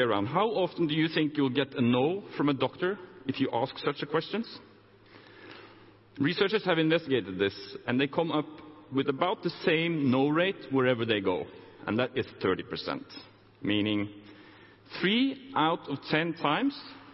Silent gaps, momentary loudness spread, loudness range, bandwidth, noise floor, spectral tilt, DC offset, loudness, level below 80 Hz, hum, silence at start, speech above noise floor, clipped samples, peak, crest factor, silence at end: none; 12 LU; 5 LU; 5.8 kHz; -56 dBFS; -9.5 dB/octave; under 0.1%; -29 LUFS; -66 dBFS; none; 0 s; 27 dB; under 0.1%; -10 dBFS; 18 dB; 0 s